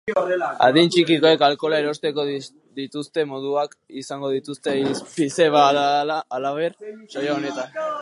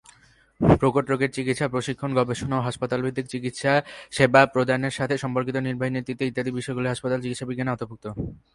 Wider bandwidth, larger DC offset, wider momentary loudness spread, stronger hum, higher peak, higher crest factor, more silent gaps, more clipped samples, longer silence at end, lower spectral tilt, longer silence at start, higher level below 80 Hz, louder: about the same, 11.5 kHz vs 11.5 kHz; neither; first, 15 LU vs 11 LU; neither; about the same, -2 dBFS vs -2 dBFS; about the same, 18 dB vs 22 dB; neither; neither; second, 0 s vs 0.2 s; second, -4.5 dB/octave vs -6 dB/octave; second, 0.05 s vs 0.6 s; second, -72 dBFS vs -48 dBFS; first, -21 LUFS vs -24 LUFS